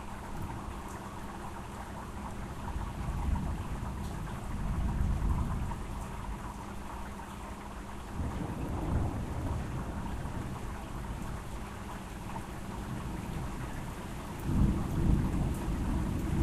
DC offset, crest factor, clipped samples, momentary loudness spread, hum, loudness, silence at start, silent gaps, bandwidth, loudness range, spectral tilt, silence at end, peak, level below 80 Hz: under 0.1%; 22 dB; under 0.1%; 11 LU; none; -37 LUFS; 0 s; none; 14 kHz; 6 LU; -7 dB/octave; 0 s; -14 dBFS; -38 dBFS